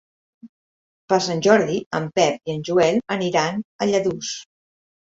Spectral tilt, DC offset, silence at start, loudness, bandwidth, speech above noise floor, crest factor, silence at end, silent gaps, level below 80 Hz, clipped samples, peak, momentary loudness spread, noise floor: -4.5 dB/octave; under 0.1%; 0.45 s; -21 LUFS; 8 kHz; over 70 dB; 20 dB; 0.7 s; 0.49-1.08 s, 1.86-1.91 s, 3.64-3.79 s; -62 dBFS; under 0.1%; -2 dBFS; 10 LU; under -90 dBFS